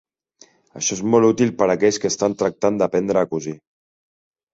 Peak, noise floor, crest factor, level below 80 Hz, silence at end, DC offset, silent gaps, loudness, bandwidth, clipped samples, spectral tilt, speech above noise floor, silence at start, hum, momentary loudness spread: -2 dBFS; -53 dBFS; 18 dB; -58 dBFS; 1 s; under 0.1%; none; -19 LUFS; 8 kHz; under 0.1%; -4.5 dB/octave; 35 dB; 0.75 s; none; 8 LU